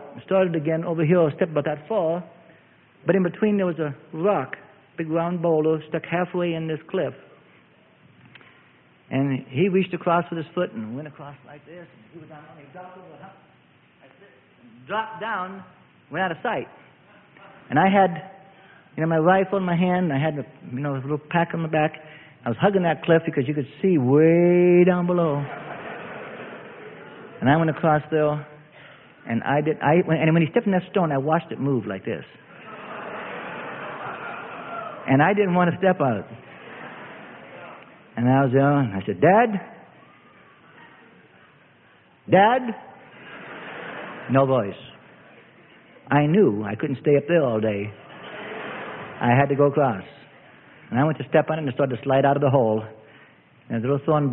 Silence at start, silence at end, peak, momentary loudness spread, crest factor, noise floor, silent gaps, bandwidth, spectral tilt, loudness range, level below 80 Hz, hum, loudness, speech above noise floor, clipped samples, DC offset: 0 s; 0 s; -4 dBFS; 21 LU; 20 dB; -56 dBFS; none; 3.9 kHz; -12 dB/octave; 9 LU; -62 dBFS; none; -22 LUFS; 35 dB; under 0.1%; under 0.1%